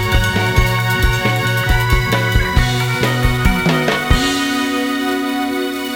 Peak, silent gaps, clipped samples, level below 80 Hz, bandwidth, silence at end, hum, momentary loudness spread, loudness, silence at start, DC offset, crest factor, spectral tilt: 0 dBFS; none; under 0.1%; -22 dBFS; 19 kHz; 0 s; none; 3 LU; -16 LUFS; 0 s; under 0.1%; 16 dB; -5 dB/octave